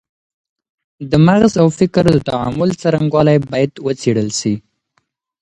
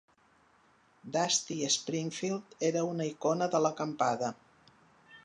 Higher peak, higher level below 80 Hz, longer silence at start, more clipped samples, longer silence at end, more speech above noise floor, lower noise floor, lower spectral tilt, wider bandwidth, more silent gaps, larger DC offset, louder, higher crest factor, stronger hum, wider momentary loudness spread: first, 0 dBFS vs -16 dBFS; first, -42 dBFS vs -80 dBFS; about the same, 1 s vs 1.05 s; neither; first, 0.8 s vs 0.05 s; first, 52 dB vs 34 dB; about the same, -65 dBFS vs -66 dBFS; first, -6.5 dB/octave vs -3.5 dB/octave; about the same, 11 kHz vs 11 kHz; neither; neither; first, -14 LUFS vs -32 LUFS; about the same, 16 dB vs 18 dB; neither; about the same, 8 LU vs 7 LU